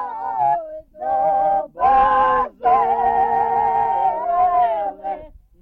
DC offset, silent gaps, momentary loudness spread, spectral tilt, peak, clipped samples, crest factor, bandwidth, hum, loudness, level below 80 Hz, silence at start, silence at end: under 0.1%; none; 11 LU; -7 dB/octave; -6 dBFS; under 0.1%; 12 dB; 4.5 kHz; none; -18 LUFS; -46 dBFS; 0 s; 0.35 s